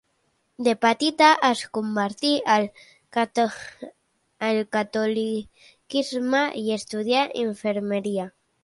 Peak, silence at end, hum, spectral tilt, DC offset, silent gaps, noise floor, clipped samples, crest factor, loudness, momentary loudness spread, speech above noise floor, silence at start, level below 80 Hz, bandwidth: -4 dBFS; 0.35 s; none; -4 dB/octave; under 0.1%; none; -70 dBFS; under 0.1%; 20 dB; -23 LUFS; 11 LU; 47 dB; 0.6 s; -70 dBFS; 11.5 kHz